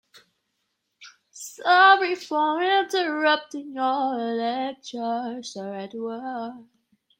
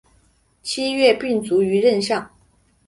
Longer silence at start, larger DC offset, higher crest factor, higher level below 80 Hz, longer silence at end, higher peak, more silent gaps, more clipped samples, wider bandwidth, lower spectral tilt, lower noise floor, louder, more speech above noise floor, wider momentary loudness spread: first, 1 s vs 0.65 s; neither; about the same, 20 dB vs 18 dB; second, -80 dBFS vs -58 dBFS; about the same, 0.55 s vs 0.6 s; second, -6 dBFS vs -2 dBFS; neither; neither; first, 16 kHz vs 11.5 kHz; second, -2.5 dB/octave vs -4.5 dB/octave; first, -77 dBFS vs -59 dBFS; second, -23 LUFS vs -19 LUFS; first, 53 dB vs 41 dB; first, 18 LU vs 9 LU